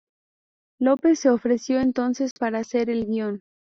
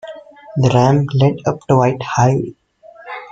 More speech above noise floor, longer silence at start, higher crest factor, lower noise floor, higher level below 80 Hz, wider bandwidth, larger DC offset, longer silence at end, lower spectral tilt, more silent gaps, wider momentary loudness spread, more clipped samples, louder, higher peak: first, over 68 dB vs 26 dB; first, 0.8 s vs 0.05 s; about the same, 16 dB vs 14 dB; first, under -90 dBFS vs -40 dBFS; second, -60 dBFS vs -48 dBFS; about the same, 7.6 kHz vs 7.8 kHz; neither; first, 0.4 s vs 0.05 s; second, -5.5 dB/octave vs -7 dB/octave; first, 2.31-2.36 s vs none; second, 8 LU vs 17 LU; neither; second, -23 LUFS vs -15 LUFS; second, -8 dBFS vs -2 dBFS